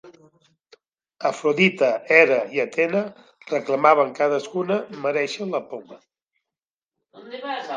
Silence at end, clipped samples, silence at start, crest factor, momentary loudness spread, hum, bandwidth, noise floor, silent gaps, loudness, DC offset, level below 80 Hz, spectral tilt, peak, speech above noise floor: 0 s; under 0.1%; 0.05 s; 22 dB; 15 LU; none; 9.4 kHz; -90 dBFS; 6.70-6.87 s; -21 LUFS; under 0.1%; -78 dBFS; -5 dB/octave; 0 dBFS; 69 dB